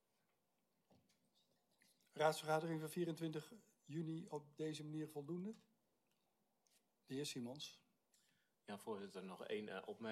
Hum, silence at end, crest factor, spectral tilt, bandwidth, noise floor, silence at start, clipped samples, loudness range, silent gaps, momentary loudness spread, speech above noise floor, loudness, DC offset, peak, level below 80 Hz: none; 0 s; 26 dB; -5 dB/octave; 15 kHz; -86 dBFS; 2.15 s; under 0.1%; 8 LU; none; 14 LU; 40 dB; -47 LUFS; under 0.1%; -24 dBFS; under -90 dBFS